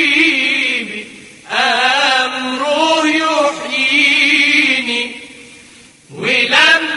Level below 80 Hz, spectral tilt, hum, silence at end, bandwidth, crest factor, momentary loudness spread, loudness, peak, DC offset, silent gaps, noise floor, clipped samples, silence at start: -60 dBFS; -1.5 dB/octave; none; 0 s; 11.5 kHz; 14 dB; 11 LU; -12 LUFS; 0 dBFS; under 0.1%; none; -42 dBFS; under 0.1%; 0 s